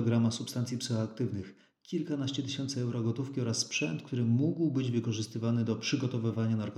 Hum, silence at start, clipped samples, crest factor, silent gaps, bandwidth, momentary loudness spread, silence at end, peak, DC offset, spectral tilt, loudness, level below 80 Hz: none; 0 s; under 0.1%; 16 dB; none; 13 kHz; 6 LU; 0 s; -16 dBFS; under 0.1%; -5.5 dB/octave; -32 LUFS; -78 dBFS